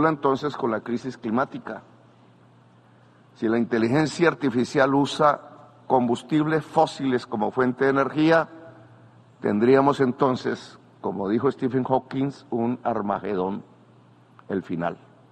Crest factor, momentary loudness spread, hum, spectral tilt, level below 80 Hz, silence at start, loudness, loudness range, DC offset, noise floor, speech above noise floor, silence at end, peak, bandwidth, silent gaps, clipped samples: 20 dB; 11 LU; none; -6.5 dB/octave; -64 dBFS; 0 s; -24 LUFS; 6 LU; under 0.1%; -54 dBFS; 31 dB; 0.35 s; -4 dBFS; 10 kHz; none; under 0.1%